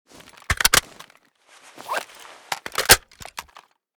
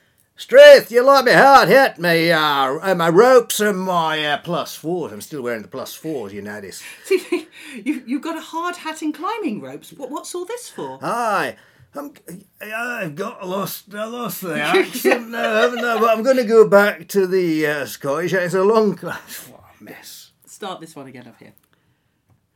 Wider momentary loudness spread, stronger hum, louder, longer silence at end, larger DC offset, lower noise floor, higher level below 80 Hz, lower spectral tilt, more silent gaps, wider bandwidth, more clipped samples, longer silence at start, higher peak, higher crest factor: about the same, 23 LU vs 21 LU; neither; second, -19 LUFS vs -16 LUFS; second, 0.55 s vs 1.35 s; neither; second, -56 dBFS vs -64 dBFS; first, -42 dBFS vs -64 dBFS; second, -0.5 dB/octave vs -4 dB/octave; neither; first, over 20 kHz vs 18 kHz; second, under 0.1% vs 0.1%; about the same, 0.5 s vs 0.4 s; about the same, 0 dBFS vs 0 dBFS; first, 24 dB vs 18 dB